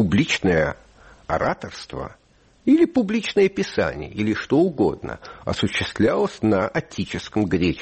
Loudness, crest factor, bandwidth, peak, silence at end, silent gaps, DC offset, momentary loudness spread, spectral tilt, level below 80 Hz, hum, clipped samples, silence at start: -22 LUFS; 14 dB; 8.8 kHz; -8 dBFS; 0 s; none; under 0.1%; 14 LU; -6 dB/octave; -46 dBFS; none; under 0.1%; 0 s